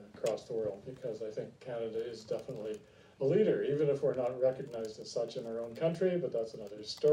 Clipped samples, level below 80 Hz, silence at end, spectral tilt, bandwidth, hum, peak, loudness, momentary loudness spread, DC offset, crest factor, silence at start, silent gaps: under 0.1%; -74 dBFS; 0 s; -6.5 dB/octave; 15 kHz; none; -18 dBFS; -35 LUFS; 12 LU; under 0.1%; 16 dB; 0 s; none